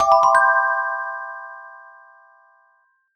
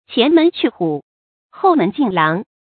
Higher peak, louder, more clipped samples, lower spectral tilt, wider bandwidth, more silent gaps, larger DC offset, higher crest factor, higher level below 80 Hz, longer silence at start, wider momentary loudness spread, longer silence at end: about the same, -2 dBFS vs 0 dBFS; about the same, -18 LUFS vs -16 LUFS; neither; second, -1 dB/octave vs -11 dB/octave; first, 9.6 kHz vs 4.6 kHz; second, none vs 1.03-1.49 s; neither; about the same, 18 dB vs 16 dB; about the same, -62 dBFS vs -64 dBFS; about the same, 0 s vs 0.1 s; first, 22 LU vs 9 LU; first, 1.4 s vs 0.25 s